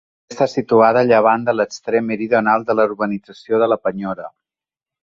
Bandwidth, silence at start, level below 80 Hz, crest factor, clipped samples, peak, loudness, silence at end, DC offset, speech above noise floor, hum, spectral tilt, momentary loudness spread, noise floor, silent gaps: 7.6 kHz; 0.3 s; -60 dBFS; 16 dB; under 0.1%; 0 dBFS; -17 LUFS; 0.75 s; under 0.1%; over 74 dB; none; -6 dB/octave; 14 LU; under -90 dBFS; none